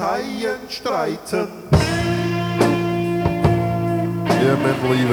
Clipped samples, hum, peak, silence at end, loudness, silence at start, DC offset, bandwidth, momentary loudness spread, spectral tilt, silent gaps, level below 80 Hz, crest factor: under 0.1%; none; -2 dBFS; 0 s; -20 LUFS; 0 s; under 0.1%; 19.5 kHz; 7 LU; -6.5 dB/octave; none; -38 dBFS; 18 dB